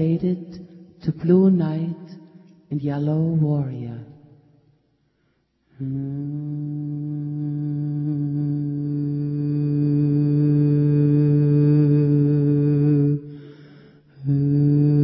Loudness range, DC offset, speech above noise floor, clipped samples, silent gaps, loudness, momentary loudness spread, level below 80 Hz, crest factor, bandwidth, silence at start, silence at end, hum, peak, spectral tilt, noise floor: 12 LU; under 0.1%; 45 dB; under 0.1%; none; -21 LUFS; 13 LU; -56 dBFS; 14 dB; 5 kHz; 0 s; 0 s; none; -6 dBFS; -13 dB/octave; -67 dBFS